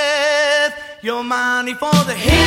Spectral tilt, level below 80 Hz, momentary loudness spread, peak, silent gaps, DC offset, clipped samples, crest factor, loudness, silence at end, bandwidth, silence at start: -4 dB/octave; -30 dBFS; 9 LU; 0 dBFS; none; under 0.1%; under 0.1%; 16 dB; -17 LUFS; 0 s; 16.5 kHz; 0 s